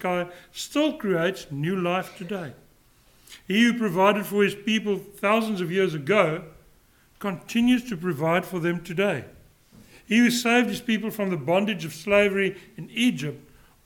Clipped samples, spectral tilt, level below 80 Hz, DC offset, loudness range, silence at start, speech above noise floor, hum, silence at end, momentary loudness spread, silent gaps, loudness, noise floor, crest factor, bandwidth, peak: under 0.1%; -5 dB/octave; -60 dBFS; under 0.1%; 4 LU; 0 s; 34 dB; none; 0.45 s; 13 LU; none; -24 LUFS; -58 dBFS; 20 dB; 18 kHz; -6 dBFS